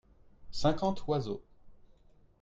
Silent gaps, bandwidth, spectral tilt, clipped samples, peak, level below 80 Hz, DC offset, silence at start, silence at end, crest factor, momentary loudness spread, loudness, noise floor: none; 7.8 kHz; -6.5 dB/octave; under 0.1%; -16 dBFS; -52 dBFS; under 0.1%; 0.4 s; 0.65 s; 18 dB; 13 LU; -34 LUFS; -61 dBFS